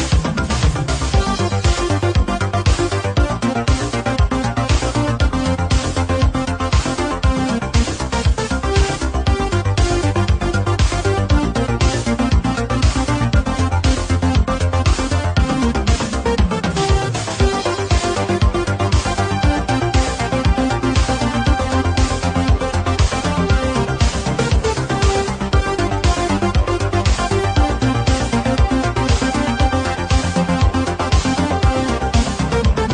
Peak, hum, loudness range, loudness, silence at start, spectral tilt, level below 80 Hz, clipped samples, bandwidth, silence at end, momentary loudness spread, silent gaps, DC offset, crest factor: -2 dBFS; none; 1 LU; -18 LUFS; 0 s; -5.5 dB/octave; -20 dBFS; under 0.1%; 10 kHz; 0 s; 2 LU; none; under 0.1%; 14 dB